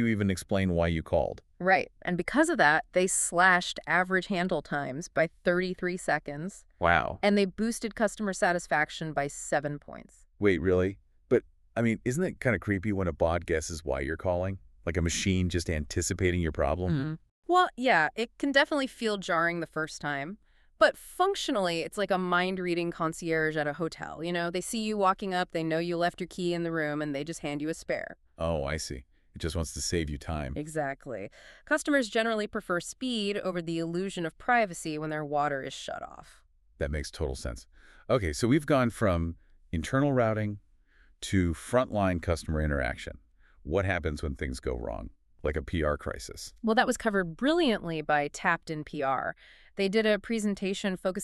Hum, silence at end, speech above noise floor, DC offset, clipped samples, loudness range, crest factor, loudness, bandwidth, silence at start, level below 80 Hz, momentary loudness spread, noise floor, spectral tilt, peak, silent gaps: none; 0 s; 32 dB; under 0.1%; under 0.1%; 6 LU; 22 dB; -29 LUFS; 13.5 kHz; 0 s; -46 dBFS; 11 LU; -61 dBFS; -5 dB/octave; -8 dBFS; 17.31-17.43 s